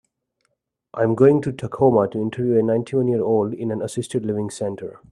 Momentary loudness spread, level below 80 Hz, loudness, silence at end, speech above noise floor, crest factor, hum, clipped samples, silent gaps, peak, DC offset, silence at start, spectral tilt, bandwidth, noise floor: 12 LU; -58 dBFS; -21 LUFS; 0.15 s; 53 dB; 18 dB; none; under 0.1%; none; -2 dBFS; under 0.1%; 0.95 s; -7.5 dB/octave; 12 kHz; -73 dBFS